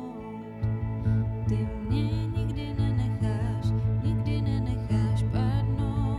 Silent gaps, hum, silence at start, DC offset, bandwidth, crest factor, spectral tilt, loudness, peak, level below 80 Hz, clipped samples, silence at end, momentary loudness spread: none; none; 0 s; under 0.1%; 5.2 kHz; 12 dB; -8.5 dB/octave; -28 LUFS; -14 dBFS; -36 dBFS; under 0.1%; 0 s; 4 LU